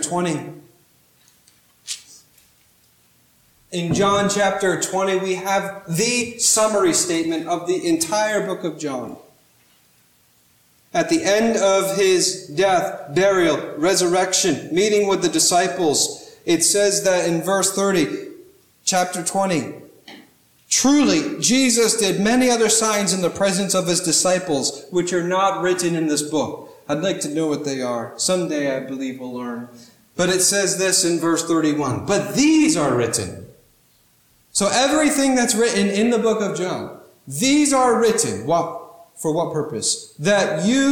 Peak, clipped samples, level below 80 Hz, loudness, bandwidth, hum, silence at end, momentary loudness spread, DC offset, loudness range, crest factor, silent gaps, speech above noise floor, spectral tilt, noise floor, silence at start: -4 dBFS; under 0.1%; -58 dBFS; -19 LUFS; 19 kHz; none; 0 s; 12 LU; under 0.1%; 6 LU; 16 dB; none; 39 dB; -3 dB/octave; -58 dBFS; 0 s